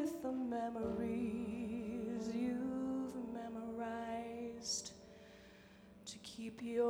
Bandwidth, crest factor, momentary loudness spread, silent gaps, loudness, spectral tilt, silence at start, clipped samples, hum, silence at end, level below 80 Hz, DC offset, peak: 17 kHz; 16 dB; 18 LU; none; -43 LUFS; -4.5 dB/octave; 0 s; under 0.1%; 60 Hz at -70 dBFS; 0 s; -68 dBFS; under 0.1%; -26 dBFS